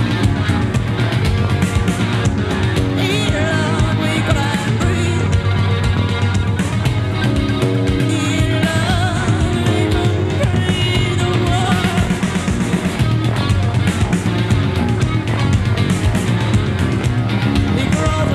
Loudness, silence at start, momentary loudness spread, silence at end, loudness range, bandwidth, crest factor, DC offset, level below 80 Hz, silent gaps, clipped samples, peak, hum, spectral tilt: -16 LUFS; 0 s; 2 LU; 0 s; 1 LU; 13 kHz; 14 dB; under 0.1%; -28 dBFS; none; under 0.1%; -2 dBFS; none; -6 dB/octave